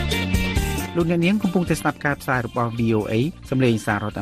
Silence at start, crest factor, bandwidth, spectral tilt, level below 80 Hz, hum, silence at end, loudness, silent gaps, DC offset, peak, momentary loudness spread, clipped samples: 0 s; 16 dB; 15 kHz; -6 dB/octave; -34 dBFS; none; 0 s; -22 LUFS; none; under 0.1%; -6 dBFS; 5 LU; under 0.1%